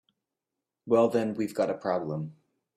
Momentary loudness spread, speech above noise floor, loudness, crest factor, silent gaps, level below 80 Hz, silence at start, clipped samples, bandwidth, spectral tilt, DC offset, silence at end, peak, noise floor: 12 LU; 60 dB; -28 LUFS; 20 dB; none; -72 dBFS; 0.85 s; under 0.1%; 14.5 kHz; -7 dB/octave; under 0.1%; 0.45 s; -10 dBFS; -88 dBFS